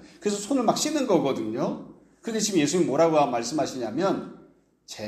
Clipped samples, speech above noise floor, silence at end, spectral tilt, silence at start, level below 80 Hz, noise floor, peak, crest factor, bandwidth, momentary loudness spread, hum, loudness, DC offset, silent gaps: under 0.1%; 31 dB; 0 s; -4.5 dB/octave; 0 s; -66 dBFS; -55 dBFS; -6 dBFS; 18 dB; 15.5 kHz; 11 LU; none; -25 LUFS; under 0.1%; none